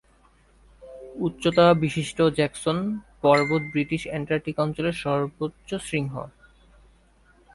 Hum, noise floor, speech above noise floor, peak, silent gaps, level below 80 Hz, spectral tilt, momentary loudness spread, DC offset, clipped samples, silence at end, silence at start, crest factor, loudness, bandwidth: none; -59 dBFS; 35 dB; -6 dBFS; none; -54 dBFS; -6 dB/octave; 14 LU; under 0.1%; under 0.1%; 1.25 s; 0.8 s; 20 dB; -24 LUFS; 11.5 kHz